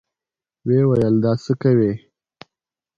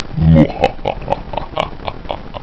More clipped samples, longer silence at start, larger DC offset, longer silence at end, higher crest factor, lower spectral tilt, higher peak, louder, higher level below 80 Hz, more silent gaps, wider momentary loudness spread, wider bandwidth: neither; first, 0.65 s vs 0 s; second, under 0.1% vs 0.8%; first, 1 s vs 0 s; about the same, 16 dB vs 16 dB; about the same, -9.5 dB/octave vs -8.5 dB/octave; second, -4 dBFS vs 0 dBFS; about the same, -18 LUFS vs -16 LUFS; second, -52 dBFS vs -26 dBFS; neither; second, 9 LU vs 16 LU; about the same, 7.4 kHz vs 8 kHz